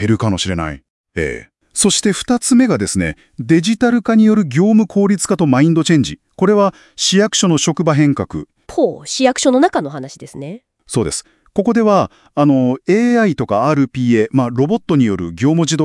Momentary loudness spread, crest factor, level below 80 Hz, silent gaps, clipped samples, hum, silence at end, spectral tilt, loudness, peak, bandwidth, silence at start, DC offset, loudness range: 12 LU; 14 dB; -46 dBFS; 0.90-1.04 s; under 0.1%; none; 0 s; -5 dB/octave; -14 LUFS; 0 dBFS; 12 kHz; 0 s; under 0.1%; 4 LU